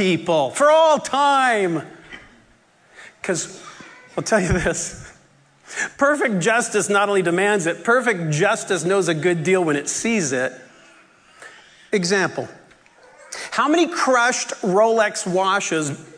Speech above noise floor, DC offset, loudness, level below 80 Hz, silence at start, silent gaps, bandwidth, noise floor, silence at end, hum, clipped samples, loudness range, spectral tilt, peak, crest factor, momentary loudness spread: 36 dB; under 0.1%; -19 LUFS; -48 dBFS; 0 s; none; 11 kHz; -55 dBFS; 0 s; none; under 0.1%; 6 LU; -4 dB/octave; -4 dBFS; 16 dB; 15 LU